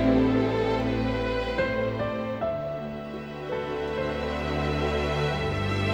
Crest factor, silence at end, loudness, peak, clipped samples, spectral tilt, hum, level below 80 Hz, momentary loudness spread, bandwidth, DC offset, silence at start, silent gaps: 16 dB; 0 s; -28 LUFS; -10 dBFS; under 0.1%; -7 dB/octave; none; -40 dBFS; 9 LU; 20 kHz; under 0.1%; 0 s; none